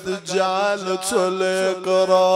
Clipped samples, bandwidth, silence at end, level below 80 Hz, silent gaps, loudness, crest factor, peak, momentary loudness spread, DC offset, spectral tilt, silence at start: under 0.1%; 15.5 kHz; 0 s; -64 dBFS; none; -20 LUFS; 16 dB; -4 dBFS; 5 LU; under 0.1%; -3.5 dB/octave; 0 s